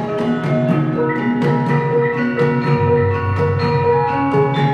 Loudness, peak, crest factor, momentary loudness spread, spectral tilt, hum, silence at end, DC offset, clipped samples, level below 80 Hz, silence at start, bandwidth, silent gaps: -17 LUFS; -4 dBFS; 12 dB; 2 LU; -9 dB/octave; none; 0 s; 0.1%; under 0.1%; -48 dBFS; 0 s; 7 kHz; none